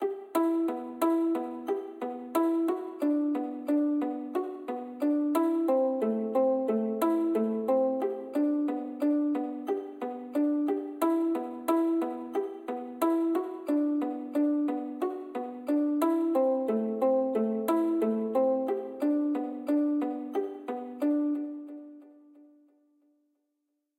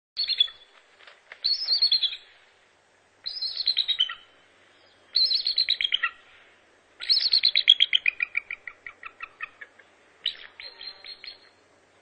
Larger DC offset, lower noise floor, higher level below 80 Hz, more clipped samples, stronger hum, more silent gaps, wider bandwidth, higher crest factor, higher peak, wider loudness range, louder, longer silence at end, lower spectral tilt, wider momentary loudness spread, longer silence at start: neither; first, -81 dBFS vs -62 dBFS; second, -86 dBFS vs -72 dBFS; neither; neither; neither; first, 16 kHz vs 9 kHz; second, 14 dB vs 26 dB; second, -14 dBFS vs -2 dBFS; second, 3 LU vs 13 LU; second, -29 LUFS vs -22 LUFS; first, 1.85 s vs 0.7 s; first, -6.5 dB/octave vs 2 dB/octave; second, 8 LU vs 22 LU; second, 0 s vs 0.15 s